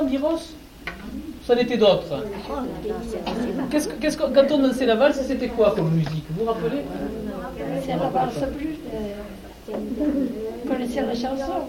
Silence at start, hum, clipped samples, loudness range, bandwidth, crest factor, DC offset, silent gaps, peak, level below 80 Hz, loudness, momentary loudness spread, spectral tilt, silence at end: 0 s; none; under 0.1%; 6 LU; 17 kHz; 18 dB; under 0.1%; none; -4 dBFS; -44 dBFS; -24 LUFS; 15 LU; -6 dB/octave; 0 s